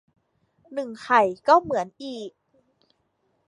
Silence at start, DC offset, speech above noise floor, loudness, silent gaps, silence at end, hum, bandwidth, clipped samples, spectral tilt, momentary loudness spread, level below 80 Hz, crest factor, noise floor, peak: 0.7 s; under 0.1%; 48 dB; -22 LUFS; none; 1.2 s; none; 11 kHz; under 0.1%; -4.5 dB/octave; 17 LU; -68 dBFS; 22 dB; -71 dBFS; -4 dBFS